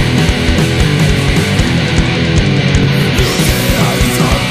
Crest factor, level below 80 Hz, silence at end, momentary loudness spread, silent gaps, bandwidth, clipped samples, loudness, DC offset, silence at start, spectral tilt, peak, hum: 10 dB; -20 dBFS; 0 s; 1 LU; none; 15.5 kHz; under 0.1%; -11 LUFS; under 0.1%; 0 s; -5 dB/octave; 0 dBFS; none